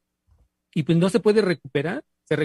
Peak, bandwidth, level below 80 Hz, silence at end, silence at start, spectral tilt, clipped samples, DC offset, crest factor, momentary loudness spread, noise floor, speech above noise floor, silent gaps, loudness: -6 dBFS; 12 kHz; -62 dBFS; 0 s; 0.75 s; -7 dB/octave; under 0.1%; under 0.1%; 16 dB; 11 LU; -63 dBFS; 42 dB; none; -22 LUFS